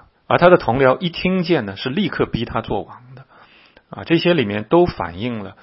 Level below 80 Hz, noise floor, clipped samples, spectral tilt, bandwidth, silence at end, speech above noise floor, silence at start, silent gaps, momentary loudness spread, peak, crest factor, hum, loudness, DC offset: -44 dBFS; -49 dBFS; under 0.1%; -10.5 dB/octave; 5.8 kHz; 0.1 s; 32 dB; 0.3 s; none; 13 LU; 0 dBFS; 18 dB; none; -18 LUFS; under 0.1%